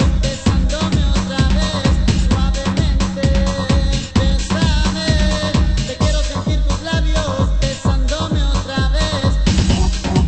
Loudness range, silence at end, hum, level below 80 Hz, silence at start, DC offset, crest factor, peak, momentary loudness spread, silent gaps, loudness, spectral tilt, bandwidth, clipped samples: 1 LU; 0 s; none; -18 dBFS; 0 s; under 0.1%; 14 dB; -2 dBFS; 3 LU; none; -17 LUFS; -5.5 dB/octave; 8.8 kHz; under 0.1%